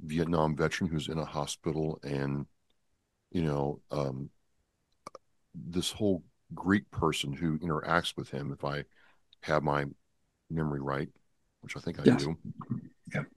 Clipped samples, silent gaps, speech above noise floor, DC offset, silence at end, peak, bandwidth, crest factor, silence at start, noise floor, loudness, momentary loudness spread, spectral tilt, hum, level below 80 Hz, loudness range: under 0.1%; none; 45 dB; under 0.1%; 0.1 s; -6 dBFS; 12.5 kHz; 28 dB; 0 s; -77 dBFS; -33 LUFS; 15 LU; -6 dB/octave; none; -56 dBFS; 5 LU